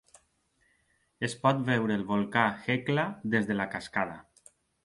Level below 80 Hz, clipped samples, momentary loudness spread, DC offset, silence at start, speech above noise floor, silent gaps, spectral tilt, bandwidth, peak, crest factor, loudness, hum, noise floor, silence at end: -66 dBFS; under 0.1%; 8 LU; under 0.1%; 1.2 s; 42 dB; none; -6 dB/octave; 11.5 kHz; -8 dBFS; 24 dB; -29 LUFS; none; -71 dBFS; 0.65 s